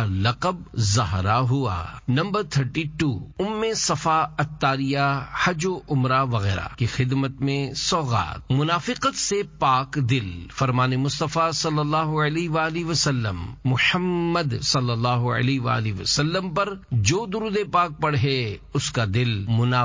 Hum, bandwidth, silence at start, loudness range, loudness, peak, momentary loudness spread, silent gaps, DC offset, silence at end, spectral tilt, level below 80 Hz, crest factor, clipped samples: none; 7.6 kHz; 0 s; 1 LU; -23 LUFS; -6 dBFS; 5 LU; none; under 0.1%; 0 s; -5 dB/octave; -44 dBFS; 16 dB; under 0.1%